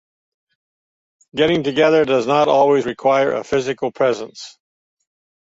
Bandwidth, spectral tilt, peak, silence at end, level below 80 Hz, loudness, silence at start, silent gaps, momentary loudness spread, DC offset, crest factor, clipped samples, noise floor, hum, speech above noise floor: 8 kHz; -5.5 dB/octave; -2 dBFS; 0.9 s; -56 dBFS; -17 LUFS; 1.35 s; none; 15 LU; under 0.1%; 16 dB; under 0.1%; under -90 dBFS; none; over 74 dB